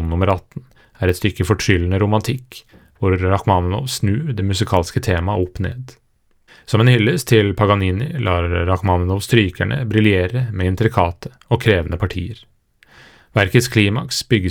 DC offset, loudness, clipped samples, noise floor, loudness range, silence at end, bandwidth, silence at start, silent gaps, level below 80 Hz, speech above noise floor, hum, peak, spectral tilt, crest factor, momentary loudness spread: under 0.1%; -18 LUFS; under 0.1%; -55 dBFS; 3 LU; 0 s; 17 kHz; 0 s; none; -42 dBFS; 38 dB; none; 0 dBFS; -6 dB/octave; 18 dB; 9 LU